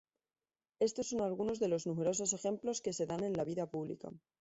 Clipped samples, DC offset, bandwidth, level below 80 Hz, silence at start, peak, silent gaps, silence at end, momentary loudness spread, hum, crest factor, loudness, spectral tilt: under 0.1%; under 0.1%; 8.2 kHz; -72 dBFS; 0.8 s; -22 dBFS; none; 0.2 s; 7 LU; none; 16 dB; -37 LUFS; -5 dB/octave